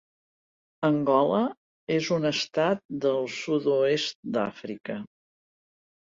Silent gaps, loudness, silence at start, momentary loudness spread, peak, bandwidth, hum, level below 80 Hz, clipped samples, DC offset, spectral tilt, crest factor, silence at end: 1.57-1.87 s, 2.85-2.89 s, 4.15-4.23 s; -26 LUFS; 0.8 s; 14 LU; -8 dBFS; 7.8 kHz; none; -70 dBFS; under 0.1%; under 0.1%; -5.5 dB/octave; 18 dB; 0.95 s